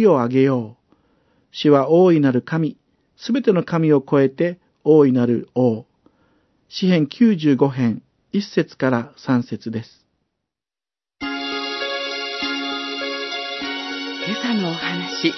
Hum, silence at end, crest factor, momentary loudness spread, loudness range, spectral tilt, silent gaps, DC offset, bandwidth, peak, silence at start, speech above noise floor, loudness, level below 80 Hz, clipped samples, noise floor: none; 0 s; 18 dB; 12 LU; 8 LU; -7 dB/octave; none; under 0.1%; 6.2 kHz; -2 dBFS; 0 s; over 73 dB; -19 LUFS; -66 dBFS; under 0.1%; under -90 dBFS